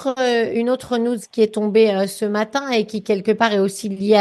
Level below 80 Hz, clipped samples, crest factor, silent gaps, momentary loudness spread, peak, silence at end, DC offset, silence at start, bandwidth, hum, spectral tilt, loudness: -62 dBFS; under 0.1%; 18 dB; none; 6 LU; -2 dBFS; 0 s; under 0.1%; 0 s; 12.5 kHz; none; -5 dB/octave; -19 LUFS